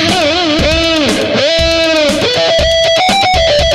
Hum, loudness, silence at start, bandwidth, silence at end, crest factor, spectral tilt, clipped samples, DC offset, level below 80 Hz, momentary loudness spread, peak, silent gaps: none; -10 LUFS; 0 s; 15 kHz; 0 s; 10 dB; -3.5 dB/octave; under 0.1%; under 0.1%; -24 dBFS; 2 LU; 0 dBFS; none